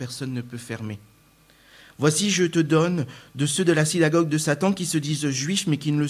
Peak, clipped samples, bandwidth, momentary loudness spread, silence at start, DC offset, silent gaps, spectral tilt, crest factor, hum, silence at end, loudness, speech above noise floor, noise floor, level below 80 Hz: -6 dBFS; under 0.1%; 15.5 kHz; 13 LU; 0 s; under 0.1%; none; -4.5 dB/octave; 18 dB; none; 0 s; -23 LUFS; 33 dB; -56 dBFS; -62 dBFS